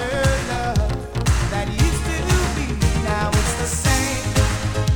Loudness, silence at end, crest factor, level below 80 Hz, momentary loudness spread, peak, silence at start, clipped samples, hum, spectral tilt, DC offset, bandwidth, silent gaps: -21 LUFS; 0 s; 16 dB; -24 dBFS; 4 LU; -4 dBFS; 0 s; under 0.1%; none; -4.5 dB/octave; under 0.1%; 19 kHz; none